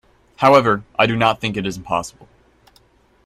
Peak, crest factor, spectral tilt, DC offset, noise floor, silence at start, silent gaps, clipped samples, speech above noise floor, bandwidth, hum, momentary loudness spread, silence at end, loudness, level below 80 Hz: 0 dBFS; 18 dB; -5.5 dB/octave; under 0.1%; -55 dBFS; 0.4 s; none; under 0.1%; 38 dB; 14.5 kHz; none; 11 LU; 1.15 s; -17 LUFS; -50 dBFS